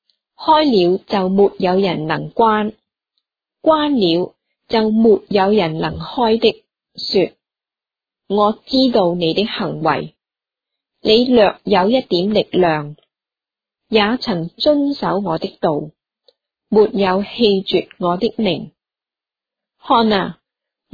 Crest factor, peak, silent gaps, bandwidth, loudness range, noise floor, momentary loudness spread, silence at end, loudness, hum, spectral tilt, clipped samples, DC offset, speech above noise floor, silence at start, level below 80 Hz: 16 dB; 0 dBFS; none; 5 kHz; 3 LU; -90 dBFS; 9 LU; 0.6 s; -16 LUFS; none; -7.5 dB/octave; under 0.1%; under 0.1%; 74 dB; 0.4 s; -50 dBFS